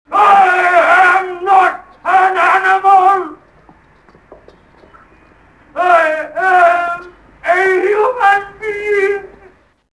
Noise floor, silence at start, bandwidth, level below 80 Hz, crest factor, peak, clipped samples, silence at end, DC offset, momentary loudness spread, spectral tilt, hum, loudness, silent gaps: -47 dBFS; 0.1 s; 11 kHz; -54 dBFS; 14 dB; 0 dBFS; under 0.1%; 0.7 s; under 0.1%; 13 LU; -3.5 dB/octave; none; -11 LUFS; none